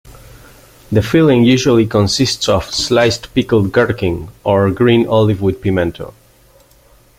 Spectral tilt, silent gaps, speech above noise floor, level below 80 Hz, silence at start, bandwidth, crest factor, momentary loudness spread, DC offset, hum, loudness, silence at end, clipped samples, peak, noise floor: -5.5 dB/octave; none; 35 dB; -40 dBFS; 0.05 s; 16 kHz; 14 dB; 8 LU; under 0.1%; none; -13 LUFS; 1.1 s; under 0.1%; -2 dBFS; -48 dBFS